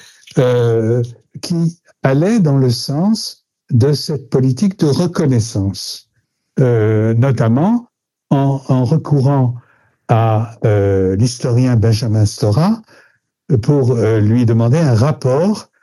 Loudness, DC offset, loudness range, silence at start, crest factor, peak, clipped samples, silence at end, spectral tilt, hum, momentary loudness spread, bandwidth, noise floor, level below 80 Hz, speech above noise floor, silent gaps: -15 LUFS; under 0.1%; 2 LU; 0.35 s; 14 dB; 0 dBFS; under 0.1%; 0.2 s; -7.5 dB/octave; none; 7 LU; 12 kHz; -65 dBFS; -52 dBFS; 52 dB; none